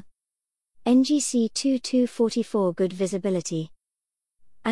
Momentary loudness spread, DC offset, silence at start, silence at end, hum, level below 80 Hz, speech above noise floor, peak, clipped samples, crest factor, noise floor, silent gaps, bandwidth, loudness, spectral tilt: 10 LU; 0.2%; 0.85 s; 0 s; none; -66 dBFS; 65 dB; -10 dBFS; under 0.1%; 14 dB; -88 dBFS; none; 12 kHz; -24 LUFS; -5 dB/octave